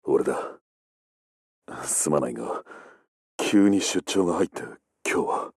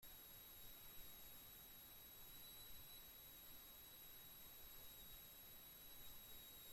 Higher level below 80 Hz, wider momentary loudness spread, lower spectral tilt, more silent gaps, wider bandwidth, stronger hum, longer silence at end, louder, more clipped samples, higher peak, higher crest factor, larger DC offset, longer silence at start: first, -66 dBFS vs -72 dBFS; first, 18 LU vs 1 LU; first, -4 dB/octave vs -1 dB/octave; first, 0.61-1.62 s, 3.08-3.39 s vs none; second, 14 kHz vs 16.5 kHz; neither; about the same, 0.1 s vs 0 s; first, -25 LUFS vs -59 LUFS; neither; first, -8 dBFS vs -46 dBFS; about the same, 18 dB vs 14 dB; neither; about the same, 0.05 s vs 0 s